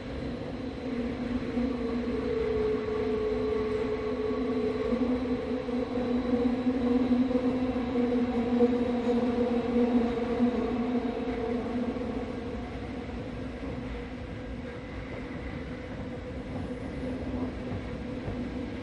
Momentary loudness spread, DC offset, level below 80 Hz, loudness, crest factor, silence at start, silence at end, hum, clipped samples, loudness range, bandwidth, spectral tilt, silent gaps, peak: 12 LU; under 0.1%; -44 dBFS; -31 LUFS; 18 dB; 0 s; 0 s; none; under 0.1%; 10 LU; 8.4 kHz; -8 dB/octave; none; -12 dBFS